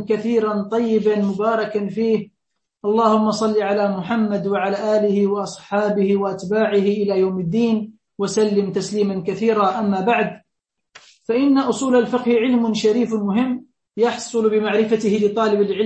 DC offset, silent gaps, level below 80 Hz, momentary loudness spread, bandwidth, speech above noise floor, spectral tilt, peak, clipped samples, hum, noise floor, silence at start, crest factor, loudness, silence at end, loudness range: under 0.1%; none; -62 dBFS; 6 LU; 8.6 kHz; 60 dB; -6 dB/octave; -4 dBFS; under 0.1%; none; -79 dBFS; 0 s; 16 dB; -19 LUFS; 0 s; 1 LU